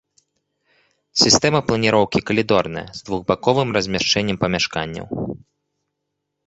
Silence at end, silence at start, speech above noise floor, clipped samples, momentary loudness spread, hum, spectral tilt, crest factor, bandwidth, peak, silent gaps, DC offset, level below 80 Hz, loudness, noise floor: 1.1 s; 1.15 s; 59 dB; under 0.1%; 14 LU; none; -3.5 dB/octave; 20 dB; 8.2 kHz; 0 dBFS; none; under 0.1%; -48 dBFS; -18 LUFS; -78 dBFS